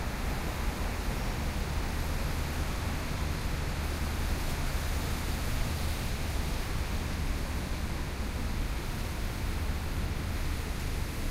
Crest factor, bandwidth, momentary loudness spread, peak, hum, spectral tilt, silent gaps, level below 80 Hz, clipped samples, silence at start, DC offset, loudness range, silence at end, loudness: 14 dB; 16 kHz; 2 LU; -18 dBFS; none; -5 dB/octave; none; -34 dBFS; under 0.1%; 0 s; under 0.1%; 1 LU; 0 s; -34 LUFS